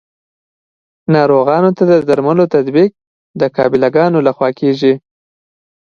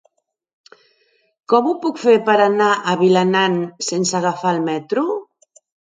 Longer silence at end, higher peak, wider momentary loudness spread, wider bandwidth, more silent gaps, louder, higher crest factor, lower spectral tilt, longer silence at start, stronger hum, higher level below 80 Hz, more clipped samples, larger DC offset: about the same, 0.85 s vs 0.75 s; about the same, 0 dBFS vs 0 dBFS; about the same, 7 LU vs 7 LU; second, 7 kHz vs 9.4 kHz; first, 3.07-3.34 s vs none; first, -12 LUFS vs -17 LUFS; about the same, 14 dB vs 18 dB; first, -8.5 dB/octave vs -4.5 dB/octave; second, 1.1 s vs 1.5 s; neither; first, -56 dBFS vs -70 dBFS; neither; neither